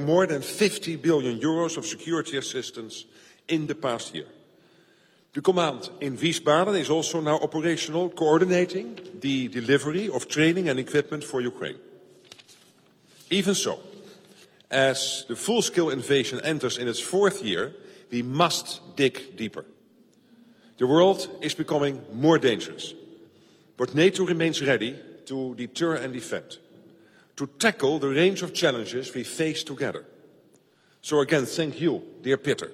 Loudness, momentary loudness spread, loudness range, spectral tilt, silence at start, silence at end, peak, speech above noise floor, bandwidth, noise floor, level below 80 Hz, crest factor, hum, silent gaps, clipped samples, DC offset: -25 LUFS; 13 LU; 5 LU; -4.5 dB/octave; 0 s; 0 s; -6 dBFS; 36 dB; 15.5 kHz; -61 dBFS; -70 dBFS; 22 dB; none; none; under 0.1%; under 0.1%